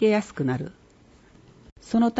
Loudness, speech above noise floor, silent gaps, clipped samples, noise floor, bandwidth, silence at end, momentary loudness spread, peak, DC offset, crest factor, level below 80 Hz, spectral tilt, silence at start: -26 LUFS; 31 dB; 1.72-1.76 s; under 0.1%; -54 dBFS; 8 kHz; 0 s; 17 LU; -10 dBFS; under 0.1%; 16 dB; -58 dBFS; -7 dB/octave; 0 s